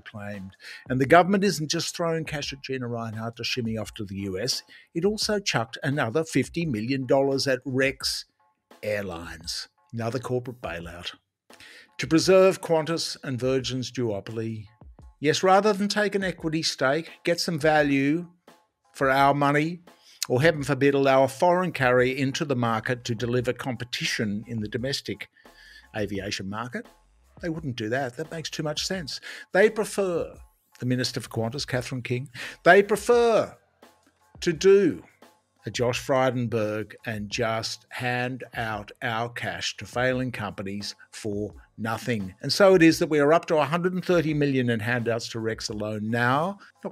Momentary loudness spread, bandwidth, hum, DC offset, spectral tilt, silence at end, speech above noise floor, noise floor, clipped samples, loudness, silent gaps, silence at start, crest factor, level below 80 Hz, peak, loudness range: 15 LU; 15.5 kHz; none; under 0.1%; -5 dB/octave; 0 s; 34 dB; -59 dBFS; under 0.1%; -25 LUFS; none; 0.05 s; 24 dB; -56 dBFS; -2 dBFS; 8 LU